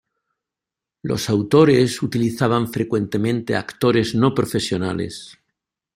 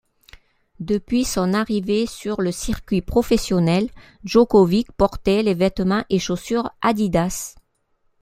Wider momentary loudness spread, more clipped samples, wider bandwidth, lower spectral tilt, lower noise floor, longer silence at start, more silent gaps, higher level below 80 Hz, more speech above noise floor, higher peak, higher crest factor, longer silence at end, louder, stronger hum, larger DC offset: first, 11 LU vs 8 LU; neither; about the same, 16 kHz vs 16 kHz; about the same, -6 dB/octave vs -5.5 dB/octave; first, -87 dBFS vs -66 dBFS; first, 1.05 s vs 0.35 s; neither; second, -54 dBFS vs -40 dBFS; first, 68 dB vs 46 dB; about the same, -2 dBFS vs -2 dBFS; about the same, 18 dB vs 18 dB; about the same, 0.65 s vs 0.7 s; about the same, -19 LUFS vs -20 LUFS; neither; neither